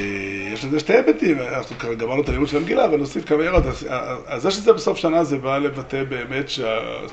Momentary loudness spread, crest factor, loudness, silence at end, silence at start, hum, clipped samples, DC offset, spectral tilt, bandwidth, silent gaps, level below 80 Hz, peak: 9 LU; 18 dB; -21 LUFS; 0 s; 0 s; none; under 0.1%; under 0.1%; -5.5 dB/octave; 8.4 kHz; none; -36 dBFS; -2 dBFS